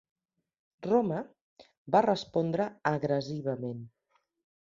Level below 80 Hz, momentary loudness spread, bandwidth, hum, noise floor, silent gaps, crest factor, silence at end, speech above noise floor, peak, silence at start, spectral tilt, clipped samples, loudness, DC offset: -72 dBFS; 14 LU; 7.6 kHz; none; -75 dBFS; 1.42-1.56 s, 1.77-1.85 s; 22 dB; 0.8 s; 46 dB; -10 dBFS; 0.8 s; -7 dB/octave; under 0.1%; -30 LUFS; under 0.1%